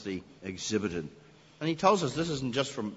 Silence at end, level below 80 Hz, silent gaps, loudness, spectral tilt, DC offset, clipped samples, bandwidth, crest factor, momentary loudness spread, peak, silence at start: 0 s; -60 dBFS; none; -31 LUFS; -4.5 dB/octave; under 0.1%; under 0.1%; 8 kHz; 22 dB; 14 LU; -10 dBFS; 0 s